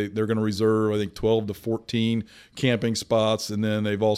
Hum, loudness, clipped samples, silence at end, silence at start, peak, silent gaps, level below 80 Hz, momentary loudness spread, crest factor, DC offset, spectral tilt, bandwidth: none; -25 LUFS; under 0.1%; 0 s; 0 s; -10 dBFS; none; -54 dBFS; 6 LU; 14 dB; under 0.1%; -6 dB/octave; 15.5 kHz